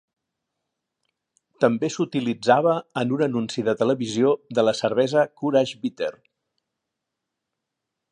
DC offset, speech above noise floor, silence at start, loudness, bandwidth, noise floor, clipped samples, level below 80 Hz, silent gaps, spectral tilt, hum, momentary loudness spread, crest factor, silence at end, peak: under 0.1%; 61 dB; 1.6 s; -23 LUFS; 10.5 kHz; -83 dBFS; under 0.1%; -70 dBFS; none; -5.5 dB/octave; none; 7 LU; 20 dB; 2 s; -4 dBFS